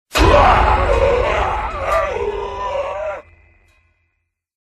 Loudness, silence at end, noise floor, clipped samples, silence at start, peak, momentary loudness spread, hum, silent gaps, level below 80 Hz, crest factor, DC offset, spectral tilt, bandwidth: -16 LUFS; 1.4 s; -71 dBFS; under 0.1%; 0.1 s; 0 dBFS; 13 LU; none; none; -24 dBFS; 18 dB; under 0.1%; -5.5 dB/octave; 13.5 kHz